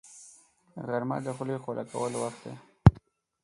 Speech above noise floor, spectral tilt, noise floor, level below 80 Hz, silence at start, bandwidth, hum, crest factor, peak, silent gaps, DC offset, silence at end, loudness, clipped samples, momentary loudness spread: 25 dB; -7.5 dB/octave; -58 dBFS; -40 dBFS; 0.15 s; 11.5 kHz; none; 28 dB; -2 dBFS; none; under 0.1%; 0.45 s; -29 LUFS; under 0.1%; 24 LU